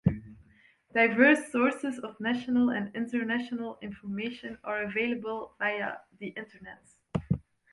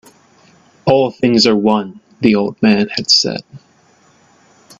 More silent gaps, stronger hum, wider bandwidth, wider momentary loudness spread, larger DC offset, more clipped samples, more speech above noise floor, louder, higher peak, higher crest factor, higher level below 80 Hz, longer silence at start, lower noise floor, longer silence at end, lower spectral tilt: neither; neither; first, 11.5 kHz vs 7.8 kHz; first, 18 LU vs 9 LU; neither; neither; second, 33 dB vs 38 dB; second, -29 LUFS vs -13 LUFS; second, -8 dBFS vs 0 dBFS; first, 22 dB vs 16 dB; about the same, -56 dBFS vs -54 dBFS; second, 0.05 s vs 0.85 s; first, -62 dBFS vs -51 dBFS; second, 0.3 s vs 1.25 s; first, -6.5 dB/octave vs -4.5 dB/octave